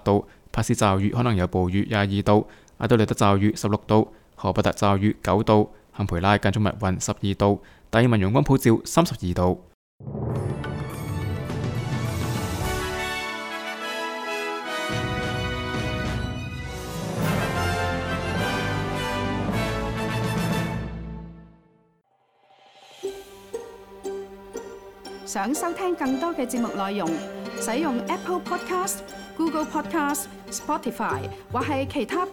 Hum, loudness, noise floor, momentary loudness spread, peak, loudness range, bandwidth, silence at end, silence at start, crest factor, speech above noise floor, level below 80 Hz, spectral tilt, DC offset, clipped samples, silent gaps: none; -25 LUFS; -65 dBFS; 14 LU; -2 dBFS; 9 LU; 18 kHz; 0 s; 0.05 s; 22 dB; 43 dB; -42 dBFS; -5.5 dB/octave; under 0.1%; under 0.1%; 9.74-9.99 s